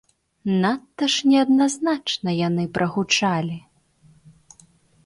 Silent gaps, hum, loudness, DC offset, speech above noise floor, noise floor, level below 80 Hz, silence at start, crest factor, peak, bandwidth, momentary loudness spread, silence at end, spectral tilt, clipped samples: none; none; -21 LUFS; under 0.1%; 35 dB; -56 dBFS; -62 dBFS; 0.45 s; 16 dB; -6 dBFS; 11.5 kHz; 8 LU; 1.45 s; -4.5 dB/octave; under 0.1%